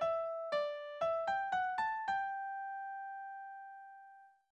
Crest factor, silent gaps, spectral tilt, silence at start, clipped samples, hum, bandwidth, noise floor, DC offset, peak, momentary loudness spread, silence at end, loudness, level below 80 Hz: 14 dB; none; -3 dB/octave; 0 s; under 0.1%; none; 9 kHz; -60 dBFS; under 0.1%; -24 dBFS; 17 LU; 0.25 s; -38 LUFS; -78 dBFS